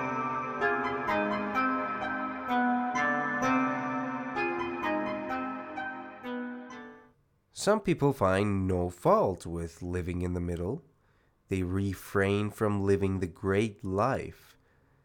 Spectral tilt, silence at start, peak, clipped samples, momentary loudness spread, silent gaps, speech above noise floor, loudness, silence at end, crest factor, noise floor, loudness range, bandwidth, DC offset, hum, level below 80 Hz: -6.5 dB/octave; 0 s; -12 dBFS; under 0.1%; 11 LU; none; 38 dB; -30 LUFS; 0.7 s; 20 dB; -67 dBFS; 5 LU; 18 kHz; under 0.1%; none; -60 dBFS